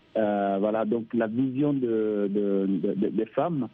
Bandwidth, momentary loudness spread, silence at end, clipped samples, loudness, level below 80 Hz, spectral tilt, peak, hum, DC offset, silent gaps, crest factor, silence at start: 3.9 kHz; 2 LU; 0.05 s; under 0.1%; -26 LUFS; -70 dBFS; -11 dB/octave; -12 dBFS; none; under 0.1%; none; 14 dB; 0.15 s